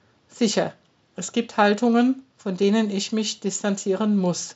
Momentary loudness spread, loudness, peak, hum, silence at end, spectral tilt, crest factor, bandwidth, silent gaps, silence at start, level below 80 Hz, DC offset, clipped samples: 11 LU; -23 LUFS; -4 dBFS; none; 0.05 s; -4.5 dB/octave; 20 dB; 8 kHz; none; 0.35 s; -78 dBFS; under 0.1%; under 0.1%